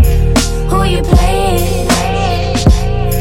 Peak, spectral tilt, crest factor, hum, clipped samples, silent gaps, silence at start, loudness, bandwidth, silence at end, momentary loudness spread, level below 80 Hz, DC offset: 0 dBFS; -5.5 dB/octave; 10 dB; none; under 0.1%; none; 0 s; -13 LUFS; 17 kHz; 0 s; 3 LU; -14 dBFS; under 0.1%